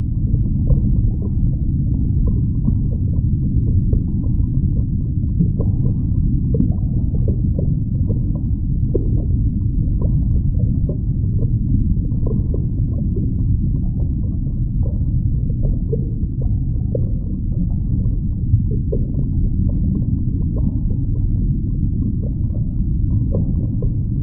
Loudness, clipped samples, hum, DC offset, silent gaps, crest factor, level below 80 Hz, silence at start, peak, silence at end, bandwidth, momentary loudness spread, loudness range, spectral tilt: -20 LUFS; under 0.1%; none; under 0.1%; none; 14 dB; -22 dBFS; 0 s; -4 dBFS; 0 s; 1.2 kHz; 3 LU; 2 LU; -17.5 dB/octave